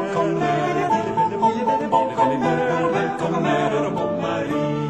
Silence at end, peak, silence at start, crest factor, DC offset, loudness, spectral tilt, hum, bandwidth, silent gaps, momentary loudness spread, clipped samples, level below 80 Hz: 0 s; -4 dBFS; 0 s; 16 dB; 0.1%; -21 LUFS; -6.5 dB/octave; none; 11.5 kHz; none; 4 LU; under 0.1%; -56 dBFS